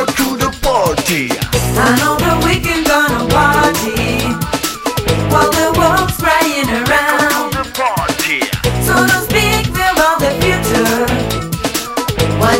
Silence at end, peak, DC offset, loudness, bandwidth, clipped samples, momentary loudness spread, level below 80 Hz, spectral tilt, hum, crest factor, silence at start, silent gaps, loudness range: 0 s; 0 dBFS; under 0.1%; -13 LUFS; 16.5 kHz; under 0.1%; 6 LU; -28 dBFS; -4 dB/octave; none; 14 dB; 0 s; none; 1 LU